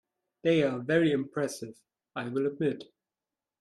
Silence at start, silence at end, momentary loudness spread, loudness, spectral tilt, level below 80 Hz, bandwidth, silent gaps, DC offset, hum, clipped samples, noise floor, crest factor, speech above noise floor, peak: 0.45 s; 0.8 s; 16 LU; -29 LUFS; -6 dB/octave; -74 dBFS; 13 kHz; none; under 0.1%; none; under 0.1%; under -90 dBFS; 18 dB; over 61 dB; -14 dBFS